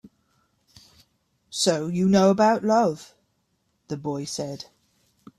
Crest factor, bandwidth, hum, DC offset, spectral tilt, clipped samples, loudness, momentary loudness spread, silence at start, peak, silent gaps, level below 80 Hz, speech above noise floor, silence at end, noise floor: 20 dB; 13 kHz; none; under 0.1%; -5 dB/octave; under 0.1%; -23 LUFS; 18 LU; 1.5 s; -6 dBFS; none; -64 dBFS; 50 dB; 0.75 s; -71 dBFS